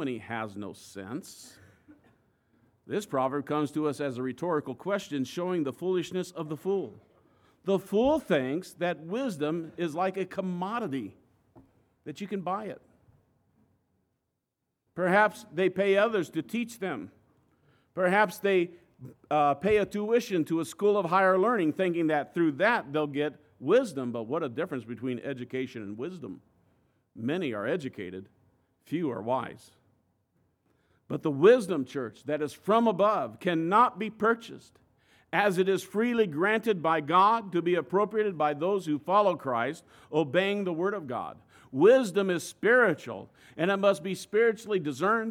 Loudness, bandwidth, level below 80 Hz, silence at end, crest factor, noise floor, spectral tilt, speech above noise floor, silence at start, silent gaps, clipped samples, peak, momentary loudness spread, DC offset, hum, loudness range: -28 LUFS; 16 kHz; -70 dBFS; 0 s; 20 dB; -83 dBFS; -6 dB/octave; 55 dB; 0 s; none; under 0.1%; -8 dBFS; 15 LU; under 0.1%; none; 10 LU